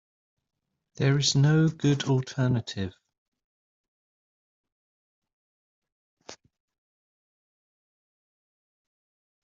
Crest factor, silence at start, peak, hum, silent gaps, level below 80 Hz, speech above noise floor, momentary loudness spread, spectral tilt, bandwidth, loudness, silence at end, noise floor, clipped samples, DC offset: 20 dB; 1 s; -10 dBFS; none; 3.18-3.32 s, 3.44-4.64 s, 4.72-5.22 s, 5.33-5.82 s, 5.92-6.17 s; -66 dBFS; over 66 dB; 13 LU; -5.5 dB/octave; 7.8 kHz; -25 LUFS; 3.1 s; under -90 dBFS; under 0.1%; under 0.1%